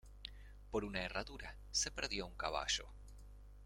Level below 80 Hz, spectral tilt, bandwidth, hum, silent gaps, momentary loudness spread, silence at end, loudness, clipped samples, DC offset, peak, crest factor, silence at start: -54 dBFS; -2 dB/octave; 16.5 kHz; none; none; 21 LU; 0 s; -41 LUFS; under 0.1%; under 0.1%; -22 dBFS; 22 dB; 0.05 s